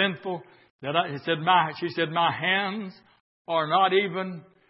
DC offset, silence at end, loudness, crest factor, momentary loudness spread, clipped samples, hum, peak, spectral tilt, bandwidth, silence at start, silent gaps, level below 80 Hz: under 0.1%; 0.3 s; -25 LUFS; 20 dB; 15 LU; under 0.1%; none; -6 dBFS; -9 dB/octave; 5.8 kHz; 0 s; 0.70-0.79 s, 3.20-3.45 s; -76 dBFS